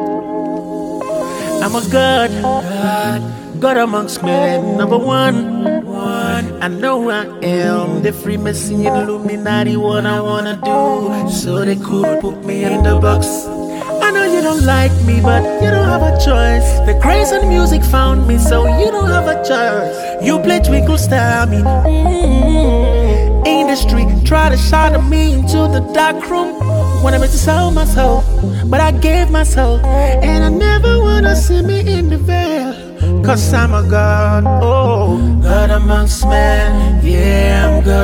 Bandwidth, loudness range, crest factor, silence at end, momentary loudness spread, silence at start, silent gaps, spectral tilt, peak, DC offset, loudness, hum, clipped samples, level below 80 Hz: 17 kHz; 4 LU; 12 dB; 0 s; 7 LU; 0 s; none; -6 dB/octave; 0 dBFS; under 0.1%; -13 LUFS; none; under 0.1%; -16 dBFS